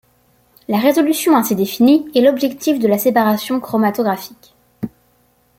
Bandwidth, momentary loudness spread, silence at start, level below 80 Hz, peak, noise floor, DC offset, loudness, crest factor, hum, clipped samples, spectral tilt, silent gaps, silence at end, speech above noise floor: 16.5 kHz; 16 LU; 0.7 s; -60 dBFS; -2 dBFS; -57 dBFS; under 0.1%; -15 LUFS; 14 dB; none; under 0.1%; -5 dB/octave; none; 0.7 s; 43 dB